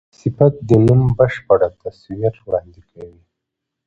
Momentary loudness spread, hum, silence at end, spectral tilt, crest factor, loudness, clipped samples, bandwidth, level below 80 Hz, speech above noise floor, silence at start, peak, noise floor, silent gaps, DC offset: 12 LU; none; 0.8 s; -10 dB/octave; 16 dB; -16 LUFS; under 0.1%; 7.4 kHz; -42 dBFS; 64 dB; 0.25 s; 0 dBFS; -80 dBFS; none; under 0.1%